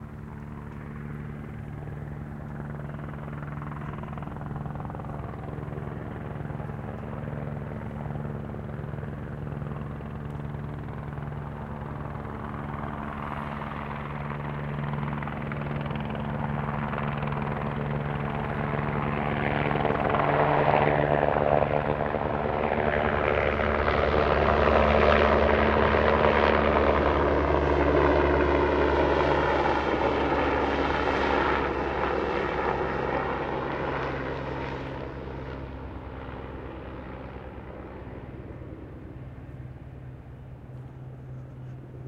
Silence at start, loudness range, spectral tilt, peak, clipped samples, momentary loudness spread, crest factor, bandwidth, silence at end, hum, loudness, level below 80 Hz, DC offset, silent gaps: 0 s; 17 LU; -8 dB/octave; -6 dBFS; under 0.1%; 18 LU; 22 dB; 7.4 kHz; 0 s; none; -27 LUFS; -40 dBFS; under 0.1%; none